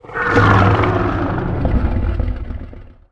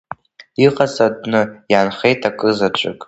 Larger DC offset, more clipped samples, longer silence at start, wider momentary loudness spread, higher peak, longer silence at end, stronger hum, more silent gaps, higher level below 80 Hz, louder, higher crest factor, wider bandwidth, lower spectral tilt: neither; neither; about the same, 0.05 s vs 0.1 s; first, 17 LU vs 9 LU; about the same, 0 dBFS vs 0 dBFS; first, 0.2 s vs 0.05 s; neither; neither; first, -24 dBFS vs -56 dBFS; about the same, -16 LUFS vs -16 LUFS; about the same, 16 dB vs 16 dB; second, 7.4 kHz vs 8.2 kHz; first, -8 dB/octave vs -5.5 dB/octave